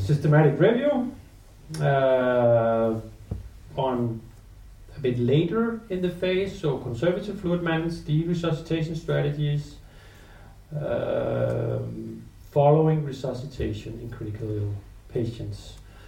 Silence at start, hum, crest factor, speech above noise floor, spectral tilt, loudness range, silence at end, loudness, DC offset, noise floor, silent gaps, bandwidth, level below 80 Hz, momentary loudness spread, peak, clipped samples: 0 s; none; 18 dB; 23 dB; -8 dB/octave; 5 LU; 0 s; -25 LUFS; under 0.1%; -47 dBFS; none; 10.5 kHz; -46 dBFS; 17 LU; -6 dBFS; under 0.1%